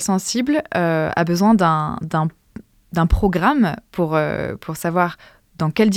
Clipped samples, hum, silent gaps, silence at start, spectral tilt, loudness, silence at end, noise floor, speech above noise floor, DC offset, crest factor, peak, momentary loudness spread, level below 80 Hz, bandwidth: under 0.1%; none; none; 0 s; -6 dB/octave; -19 LUFS; 0 s; -41 dBFS; 23 dB; under 0.1%; 16 dB; -2 dBFS; 9 LU; -34 dBFS; 16.5 kHz